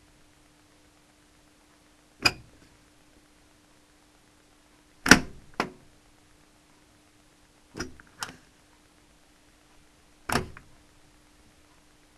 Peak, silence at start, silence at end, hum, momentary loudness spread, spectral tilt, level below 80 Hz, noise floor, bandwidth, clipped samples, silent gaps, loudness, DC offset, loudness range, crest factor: 0 dBFS; 2.2 s; 1.7 s; none; 26 LU; -2.5 dB/octave; -52 dBFS; -60 dBFS; 13 kHz; under 0.1%; none; -26 LUFS; under 0.1%; 18 LU; 34 dB